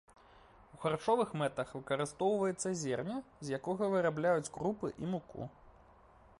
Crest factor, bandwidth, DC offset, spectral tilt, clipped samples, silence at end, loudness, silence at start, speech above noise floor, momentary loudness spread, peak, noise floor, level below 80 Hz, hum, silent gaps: 18 dB; 11.5 kHz; under 0.1%; -5.5 dB/octave; under 0.1%; 0.7 s; -36 LUFS; 0.75 s; 27 dB; 9 LU; -18 dBFS; -62 dBFS; -66 dBFS; none; none